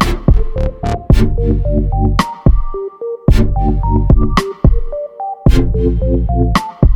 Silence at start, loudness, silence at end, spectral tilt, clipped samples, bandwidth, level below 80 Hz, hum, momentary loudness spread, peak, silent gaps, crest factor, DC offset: 0 s; -15 LUFS; 0 s; -7.5 dB/octave; under 0.1%; 12 kHz; -14 dBFS; none; 8 LU; 0 dBFS; none; 12 dB; under 0.1%